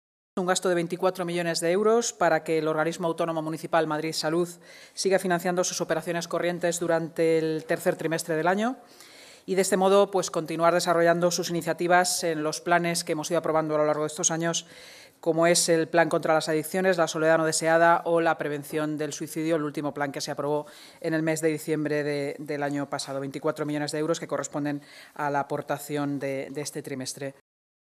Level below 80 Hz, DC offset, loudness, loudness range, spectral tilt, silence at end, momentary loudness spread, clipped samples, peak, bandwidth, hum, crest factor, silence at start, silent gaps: -76 dBFS; under 0.1%; -26 LUFS; 6 LU; -4 dB/octave; 0.55 s; 10 LU; under 0.1%; -6 dBFS; 15.5 kHz; none; 20 dB; 0.35 s; none